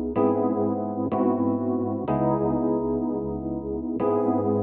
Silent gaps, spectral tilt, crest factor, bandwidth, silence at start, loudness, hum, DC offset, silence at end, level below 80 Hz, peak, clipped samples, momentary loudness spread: none; -12.5 dB/octave; 14 dB; 3.3 kHz; 0 s; -25 LUFS; none; under 0.1%; 0 s; -48 dBFS; -10 dBFS; under 0.1%; 7 LU